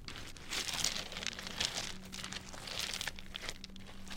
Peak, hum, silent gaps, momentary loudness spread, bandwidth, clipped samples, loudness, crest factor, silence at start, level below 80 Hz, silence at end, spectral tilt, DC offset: -12 dBFS; none; none; 12 LU; 17 kHz; under 0.1%; -39 LUFS; 30 dB; 0 s; -52 dBFS; 0 s; -1 dB/octave; under 0.1%